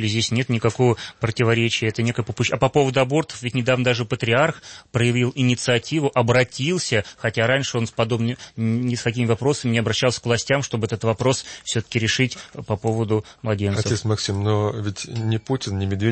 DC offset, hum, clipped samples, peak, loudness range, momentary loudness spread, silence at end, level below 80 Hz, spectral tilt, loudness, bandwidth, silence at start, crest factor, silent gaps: under 0.1%; none; under 0.1%; -4 dBFS; 3 LU; 7 LU; 0 s; -52 dBFS; -5 dB/octave; -21 LUFS; 8.8 kHz; 0 s; 18 dB; none